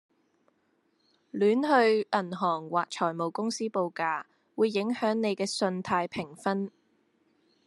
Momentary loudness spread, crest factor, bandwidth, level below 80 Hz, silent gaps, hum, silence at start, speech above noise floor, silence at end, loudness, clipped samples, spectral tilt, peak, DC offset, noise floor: 10 LU; 20 dB; 12 kHz; -76 dBFS; none; none; 1.35 s; 44 dB; 0.95 s; -29 LUFS; under 0.1%; -5 dB/octave; -10 dBFS; under 0.1%; -72 dBFS